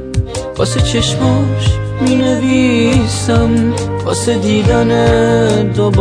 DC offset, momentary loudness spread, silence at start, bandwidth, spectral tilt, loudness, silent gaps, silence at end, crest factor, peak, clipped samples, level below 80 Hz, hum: under 0.1%; 6 LU; 0 s; 10.5 kHz; -6 dB/octave; -13 LUFS; none; 0 s; 12 dB; 0 dBFS; under 0.1%; -26 dBFS; none